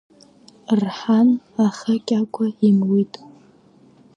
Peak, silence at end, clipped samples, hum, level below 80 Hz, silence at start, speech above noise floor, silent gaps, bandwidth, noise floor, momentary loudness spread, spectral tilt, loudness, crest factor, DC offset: -6 dBFS; 1.1 s; under 0.1%; none; -68 dBFS; 0.7 s; 33 dB; none; 7.8 kHz; -52 dBFS; 8 LU; -7.5 dB/octave; -19 LUFS; 14 dB; under 0.1%